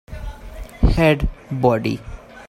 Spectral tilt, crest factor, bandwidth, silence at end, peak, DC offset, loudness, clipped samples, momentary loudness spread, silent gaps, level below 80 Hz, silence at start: -7.5 dB/octave; 18 dB; 15.5 kHz; 0.05 s; -2 dBFS; under 0.1%; -19 LUFS; under 0.1%; 21 LU; none; -26 dBFS; 0.1 s